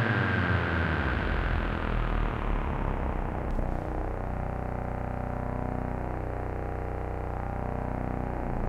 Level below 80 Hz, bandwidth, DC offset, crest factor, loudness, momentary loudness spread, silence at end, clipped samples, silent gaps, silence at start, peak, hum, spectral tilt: -34 dBFS; 6.8 kHz; under 0.1%; 18 dB; -32 LUFS; 7 LU; 0 s; under 0.1%; none; 0 s; -12 dBFS; none; -8 dB/octave